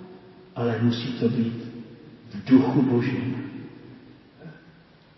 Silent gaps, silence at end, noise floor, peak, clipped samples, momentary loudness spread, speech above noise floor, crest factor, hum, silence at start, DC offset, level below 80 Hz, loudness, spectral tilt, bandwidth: none; 0.6 s; -53 dBFS; -6 dBFS; under 0.1%; 26 LU; 30 dB; 20 dB; none; 0 s; under 0.1%; -64 dBFS; -24 LUFS; -9 dB/octave; 6 kHz